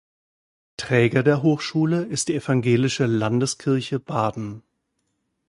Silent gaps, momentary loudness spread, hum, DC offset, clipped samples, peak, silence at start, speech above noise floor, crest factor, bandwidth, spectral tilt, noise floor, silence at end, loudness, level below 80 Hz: none; 8 LU; none; under 0.1%; under 0.1%; -4 dBFS; 0.8 s; 53 dB; 18 dB; 11.5 kHz; -5.5 dB/octave; -74 dBFS; 0.9 s; -22 LUFS; -58 dBFS